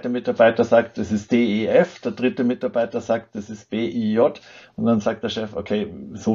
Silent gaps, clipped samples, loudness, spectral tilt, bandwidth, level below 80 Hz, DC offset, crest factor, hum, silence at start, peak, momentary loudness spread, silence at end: none; under 0.1%; -21 LUFS; -6.5 dB/octave; 7.6 kHz; -58 dBFS; under 0.1%; 18 dB; none; 0.05 s; -2 dBFS; 11 LU; 0 s